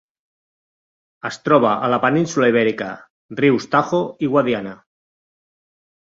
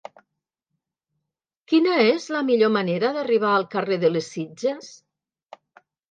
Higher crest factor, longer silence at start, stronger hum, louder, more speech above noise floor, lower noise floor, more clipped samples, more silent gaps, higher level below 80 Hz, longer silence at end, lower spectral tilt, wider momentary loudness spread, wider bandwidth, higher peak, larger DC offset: about the same, 18 dB vs 18 dB; second, 1.25 s vs 1.7 s; neither; first, -18 LUFS vs -22 LUFS; first, over 72 dB vs 61 dB; first, under -90 dBFS vs -82 dBFS; neither; first, 3.10-3.29 s vs none; first, -62 dBFS vs -76 dBFS; first, 1.35 s vs 1.15 s; about the same, -6 dB/octave vs -5.5 dB/octave; first, 14 LU vs 9 LU; second, 7.8 kHz vs 9 kHz; first, -2 dBFS vs -6 dBFS; neither